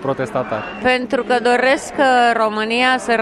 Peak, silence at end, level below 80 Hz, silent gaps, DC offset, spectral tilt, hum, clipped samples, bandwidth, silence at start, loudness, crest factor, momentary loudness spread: -2 dBFS; 0 s; -52 dBFS; none; under 0.1%; -4 dB/octave; none; under 0.1%; 12 kHz; 0 s; -16 LUFS; 14 dB; 8 LU